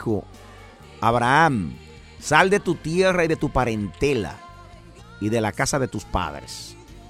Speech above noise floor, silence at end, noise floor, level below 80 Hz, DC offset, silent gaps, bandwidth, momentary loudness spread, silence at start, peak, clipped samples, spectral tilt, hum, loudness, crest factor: 23 dB; 0.05 s; -44 dBFS; -42 dBFS; under 0.1%; none; 15.5 kHz; 17 LU; 0 s; -2 dBFS; under 0.1%; -5 dB/octave; none; -22 LUFS; 22 dB